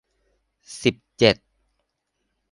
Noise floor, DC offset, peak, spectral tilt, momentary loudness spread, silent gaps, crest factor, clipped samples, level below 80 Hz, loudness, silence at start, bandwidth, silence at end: -76 dBFS; under 0.1%; -2 dBFS; -4.5 dB/octave; 11 LU; none; 24 dB; under 0.1%; -56 dBFS; -22 LUFS; 0.7 s; 11.5 kHz; 1.2 s